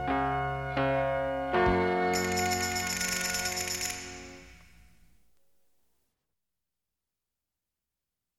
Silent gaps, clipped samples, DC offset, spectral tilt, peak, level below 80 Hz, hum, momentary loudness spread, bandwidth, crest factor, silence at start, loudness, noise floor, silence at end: none; under 0.1%; under 0.1%; -3.5 dB/octave; -14 dBFS; -50 dBFS; none; 7 LU; 17 kHz; 18 dB; 0 s; -29 LUFS; -89 dBFS; 3.8 s